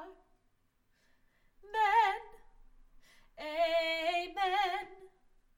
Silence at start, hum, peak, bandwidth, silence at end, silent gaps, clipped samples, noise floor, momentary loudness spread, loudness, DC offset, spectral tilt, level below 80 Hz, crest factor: 0 s; none; -18 dBFS; 16.5 kHz; 0.5 s; none; under 0.1%; -73 dBFS; 16 LU; -32 LUFS; under 0.1%; -1.5 dB/octave; -64 dBFS; 18 dB